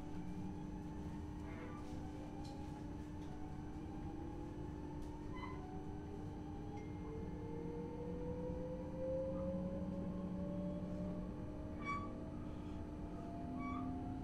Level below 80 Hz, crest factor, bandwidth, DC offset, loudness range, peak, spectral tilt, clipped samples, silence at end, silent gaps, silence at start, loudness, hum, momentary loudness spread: -54 dBFS; 14 dB; 11.5 kHz; under 0.1%; 5 LU; -32 dBFS; -8 dB/octave; under 0.1%; 0 s; none; 0 s; -47 LUFS; none; 6 LU